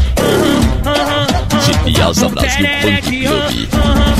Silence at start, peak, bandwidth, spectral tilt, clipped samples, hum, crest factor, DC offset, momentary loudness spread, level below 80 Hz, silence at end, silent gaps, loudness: 0 s; 0 dBFS; 15.5 kHz; -4.5 dB/octave; under 0.1%; none; 12 dB; 1%; 3 LU; -20 dBFS; 0 s; none; -13 LUFS